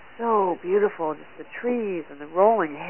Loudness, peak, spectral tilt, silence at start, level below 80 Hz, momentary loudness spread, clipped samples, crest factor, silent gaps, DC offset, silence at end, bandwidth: -24 LUFS; -6 dBFS; -10 dB/octave; 0.2 s; -70 dBFS; 12 LU; under 0.1%; 18 dB; none; 0.4%; 0 s; 3.2 kHz